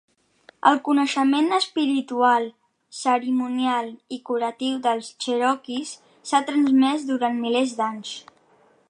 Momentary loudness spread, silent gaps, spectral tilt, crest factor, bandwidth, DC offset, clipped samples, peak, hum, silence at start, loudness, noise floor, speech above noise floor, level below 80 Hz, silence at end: 14 LU; none; -3 dB/octave; 20 dB; 10.5 kHz; under 0.1%; under 0.1%; -2 dBFS; none; 0.65 s; -22 LUFS; -59 dBFS; 37 dB; -78 dBFS; 0.7 s